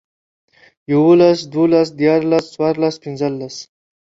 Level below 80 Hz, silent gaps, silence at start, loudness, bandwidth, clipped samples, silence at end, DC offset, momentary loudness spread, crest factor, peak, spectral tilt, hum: -60 dBFS; none; 0.9 s; -15 LUFS; 7.8 kHz; under 0.1%; 0.55 s; under 0.1%; 12 LU; 14 dB; -2 dBFS; -7 dB/octave; none